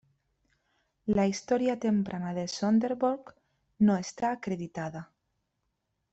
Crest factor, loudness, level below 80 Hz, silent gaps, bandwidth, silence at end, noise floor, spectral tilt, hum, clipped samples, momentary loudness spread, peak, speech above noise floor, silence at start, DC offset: 16 dB; -30 LUFS; -64 dBFS; none; 8.2 kHz; 1.1 s; -80 dBFS; -6 dB/octave; none; under 0.1%; 12 LU; -14 dBFS; 52 dB; 1.05 s; under 0.1%